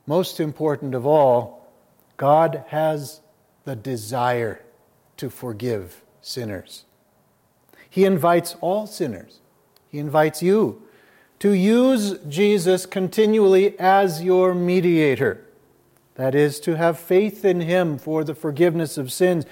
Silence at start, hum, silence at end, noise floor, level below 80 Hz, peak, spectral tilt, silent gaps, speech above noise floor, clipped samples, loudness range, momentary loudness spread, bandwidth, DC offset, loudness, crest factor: 0.05 s; none; 0.05 s; -62 dBFS; -70 dBFS; -4 dBFS; -6 dB/octave; none; 42 dB; under 0.1%; 10 LU; 15 LU; 17 kHz; under 0.1%; -20 LUFS; 16 dB